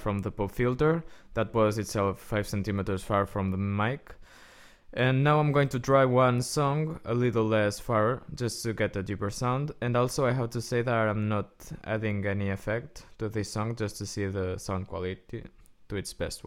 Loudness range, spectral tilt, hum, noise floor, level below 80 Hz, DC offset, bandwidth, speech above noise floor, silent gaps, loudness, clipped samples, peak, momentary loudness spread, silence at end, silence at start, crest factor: 7 LU; -6 dB/octave; none; -53 dBFS; -50 dBFS; under 0.1%; 16 kHz; 25 dB; none; -29 LUFS; under 0.1%; -10 dBFS; 11 LU; 0.05 s; 0 s; 18 dB